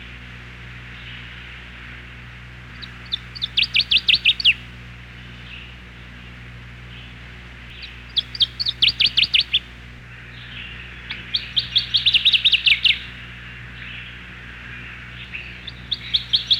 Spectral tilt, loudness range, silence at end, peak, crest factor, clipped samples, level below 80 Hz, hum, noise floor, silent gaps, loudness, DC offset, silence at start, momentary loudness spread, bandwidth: -2 dB/octave; 15 LU; 0 s; -6 dBFS; 18 dB; under 0.1%; -44 dBFS; 60 Hz at -45 dBFS; -39 dBFS; none; -17 LUFS; under 0.1%; 0 s; 25 LU; 16 kHz